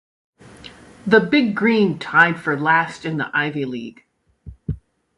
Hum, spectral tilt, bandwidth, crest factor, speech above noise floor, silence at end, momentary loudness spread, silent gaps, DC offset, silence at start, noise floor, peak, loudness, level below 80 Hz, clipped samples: none; -6.5 dB/octave; 11.5 kHz; 20 dB; 24 dB; 0.4 s; 17 LU; none; under 0.1%; 0.65 s; -42 dBFS; 0 dBFS; -18 LUFS; -46 dBFS; under 0.1%